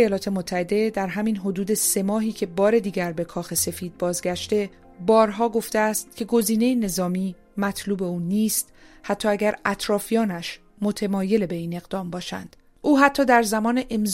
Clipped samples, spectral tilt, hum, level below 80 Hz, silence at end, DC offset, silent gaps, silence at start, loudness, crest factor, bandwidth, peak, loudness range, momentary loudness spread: under 0.1%; -4.5 dB/octave; none; -52 dBFS; 0 s; under 0.1%; none; 0 s; -23 LUFS; 20 dB; 16 kHz; -2 dBFS; 2 LU; 11 LU